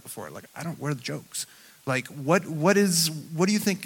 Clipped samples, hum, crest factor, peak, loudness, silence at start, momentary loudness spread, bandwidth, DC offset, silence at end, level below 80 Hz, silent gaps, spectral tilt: under 0.1%; none; 20 dB; -6 dBFS; -25 LUFS; 0.05 s; 17 LU; 17.5 kHz; under 0.1%; 0 s; -72 dBFS; none; -4 dB/octave